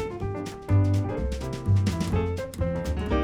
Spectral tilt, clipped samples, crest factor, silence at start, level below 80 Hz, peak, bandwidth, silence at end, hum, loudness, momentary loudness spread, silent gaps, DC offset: -7.5 dB/octave; under 0.1%; 14 dB; 0 s; -36 dBFS; -12 dBFS; 13 kHz; 0 s; none; -27 LUFS; 8 LU; none; under 0.1%